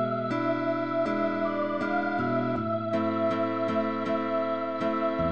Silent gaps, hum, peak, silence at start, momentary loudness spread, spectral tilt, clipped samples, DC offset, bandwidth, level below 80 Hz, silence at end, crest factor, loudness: none; none; -16 dBFS; 0 s; 2 LU; -8 dB/octave; under 0.1%; 0.3%; 8.2 kHz; -58 dBFS; 0 s; 12 dB; -28 LUFS